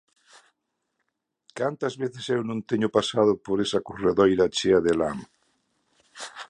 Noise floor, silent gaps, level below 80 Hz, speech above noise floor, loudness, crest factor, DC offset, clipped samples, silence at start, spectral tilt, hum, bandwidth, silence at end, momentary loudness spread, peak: -79 dBFS; none; -56 dBFS; 55 dB; -24 LUFS; 20 dB; under 0.1%; under 0.1%; 1.55 s; -5 dB/octave; none; 11 kHz; 0.05 s; 11 LU; -6 dBFS